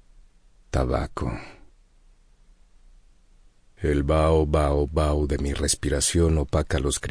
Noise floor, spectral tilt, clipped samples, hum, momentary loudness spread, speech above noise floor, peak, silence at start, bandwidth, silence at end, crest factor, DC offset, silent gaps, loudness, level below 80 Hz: -55 dBFS; -5 dB/octave; under 0.1%; none; 10 LU; 33 dB; -8 dBFS; 0.75 s; 10.5 kHz; 0 s; 16 dB; under 0.1%; none; -24 LUFS; -32 dBFS